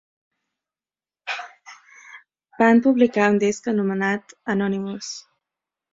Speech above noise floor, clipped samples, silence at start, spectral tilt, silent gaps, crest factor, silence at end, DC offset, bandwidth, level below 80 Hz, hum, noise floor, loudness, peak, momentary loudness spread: over 70 dB; under 0.1%; 1.25 s; -5.5 dB/octave; none; 20 dB; 0.75 s; under 0.1%; 7.8 kHz; -66 dBFS; none; under -90 dBFS; -21 LUFS; -2 dBFS; 17 LU